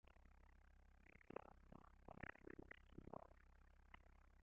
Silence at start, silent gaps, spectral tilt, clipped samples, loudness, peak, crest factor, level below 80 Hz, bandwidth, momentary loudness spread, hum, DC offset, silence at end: 0.05 s; none; -5.5 dB/octave; under 0.1%; -62 LUFS; -36 dBFS; 26 dB; -70 dBFS; 6.6 kHz; 10 LU; none; under 0.1%; 0 s